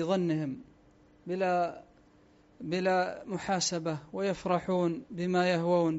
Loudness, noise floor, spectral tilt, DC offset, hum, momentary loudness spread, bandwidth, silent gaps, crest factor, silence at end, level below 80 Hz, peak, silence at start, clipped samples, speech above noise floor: -31 LUFS; -61 dBFS; -5 dB/octave; under 0.1%; none; 11 LU; 8 kHz; none; 16 dB; 0 s; -66 dBFS; -16 dBFS; 0 s; under 0.1%; 31 dB